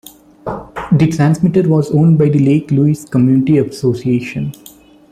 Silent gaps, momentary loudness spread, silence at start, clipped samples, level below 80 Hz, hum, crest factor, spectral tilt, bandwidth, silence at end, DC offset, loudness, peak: none; 14 LU; 0.45 s; under 0.1%; -46 dBFS; none; 12 dB; -8.5 dB/octave; 14.5 kHz; 0.6 s; under 0.1%; -13 LUFS; -2 dBFS